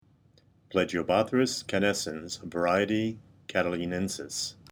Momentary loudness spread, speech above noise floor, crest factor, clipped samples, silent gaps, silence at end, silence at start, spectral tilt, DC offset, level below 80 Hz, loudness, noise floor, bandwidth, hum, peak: 9 LU; 34 dB; 20 dB; under 0.1%; none; 0.2 s; 0.7 s; -4 dB/octave; under 0.1%; -62 dBFS; -29 LUFS; -62 dBFS; over 20 kHz; none; -10 dBFS